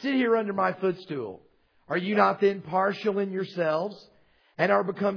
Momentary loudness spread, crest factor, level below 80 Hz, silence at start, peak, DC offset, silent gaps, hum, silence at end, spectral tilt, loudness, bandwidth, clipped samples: 11 LU; 20 dB; -76 dBFS; 0 s; -6 dBFS; under 0.1%; none; none; 0 s; -7.5 dB/octave; -26 LUFS; 5.4 kHz; under 0.1%